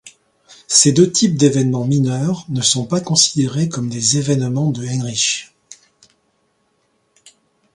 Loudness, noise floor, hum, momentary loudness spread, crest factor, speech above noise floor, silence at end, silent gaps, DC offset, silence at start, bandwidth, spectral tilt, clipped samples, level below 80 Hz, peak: -16 LUFS; -64 dBFS; none; 9 LU; 18 dB; 48 dB; 2 s; none; under 0.1%; 0.05 s; 11.5 kHz; -4 dB/octave; under 0.1%; -56 dBFS; 0 dBFS